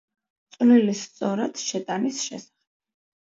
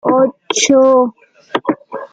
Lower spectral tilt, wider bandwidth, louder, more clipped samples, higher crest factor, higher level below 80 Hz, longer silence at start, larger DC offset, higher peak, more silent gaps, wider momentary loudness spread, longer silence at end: first, -4.5 dB/octave vs -2.5 dB/octave; second, 8 kHz vs 9.2 kHz; second, -23 LUFS vs -14 LUFS; neither; about the same, 18 dB vs 14 dB; second, -78 dBFS vs -62 dBFS; first, 0.6 s vs 0.05 s; neither; second, -8 dBFS vs 0 dBFS; neither; about the same, 13 LU vs 12 LU; first, 0.85 s vs 0.05 s